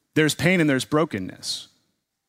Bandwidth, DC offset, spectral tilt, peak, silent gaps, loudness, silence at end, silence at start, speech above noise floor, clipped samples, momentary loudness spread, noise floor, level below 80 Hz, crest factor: 16 kHz; under 0.1%; -5 dB/octave; -6 dBFS; none; -22 LUFS; 0.65 s; 0.15 s; 51 dB; under 0.1%; 11 LU; -73 dBFS; -58 dBFS; 18 dB